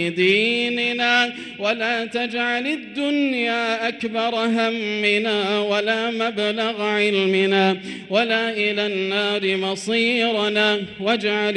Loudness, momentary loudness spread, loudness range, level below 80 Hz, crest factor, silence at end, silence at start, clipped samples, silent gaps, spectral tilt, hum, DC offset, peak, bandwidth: -20 LUFS; 6 LU; 2 LU; -66 dBFS; 16 dB; 0 s; 0 s; under 0.1%; none; -4.5 dB/octave; none; under 0.1%; -6 dBFS; 11.5 kHz